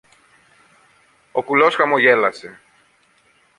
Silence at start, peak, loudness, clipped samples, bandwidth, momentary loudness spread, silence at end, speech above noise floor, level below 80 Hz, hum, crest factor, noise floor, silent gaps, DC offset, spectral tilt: 1.35 s; -2 dBFS; -16 LUFS; under 0.1%; 11 kHz; 13 LU; 1.05 s; 42 dB; -68 dBFS; none; 20 dB; -58 dBFS; none; under 0.1%; -5 dB/octave